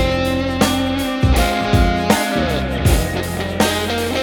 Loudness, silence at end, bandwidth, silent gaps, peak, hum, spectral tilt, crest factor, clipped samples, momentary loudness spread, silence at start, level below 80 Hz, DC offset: -17 LUFS; 0 s; 19.5 kHz; none; 0 dBFS; none; -5 dB/octave; 16 dB; under 0.1%; 4 LU; 0 s; -24 dBFS; under 0.1%